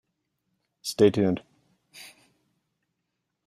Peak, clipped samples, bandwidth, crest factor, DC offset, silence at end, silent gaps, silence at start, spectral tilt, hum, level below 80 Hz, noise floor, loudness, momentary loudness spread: -6 dBFS; under 0.1%; 14 kHz; 24 dB; under 0.1%; 1.4 s; none; 0.85 s; -6 dB/octave; none; -68 dBFS; -81 dBFS; -25 LUFS; 25 LU